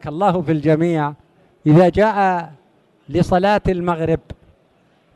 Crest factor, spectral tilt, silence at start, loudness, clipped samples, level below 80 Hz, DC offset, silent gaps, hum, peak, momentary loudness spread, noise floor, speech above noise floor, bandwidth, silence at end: 16 dB; -8 dB/octave; 0.05 s; -17 LUFS; under 0.1%; -40 dBFS; under 0.1%; none; none; -2 dBFS; 11 LU; -57 dBFS; 41 dB; 11.5 kHz; 0.85 s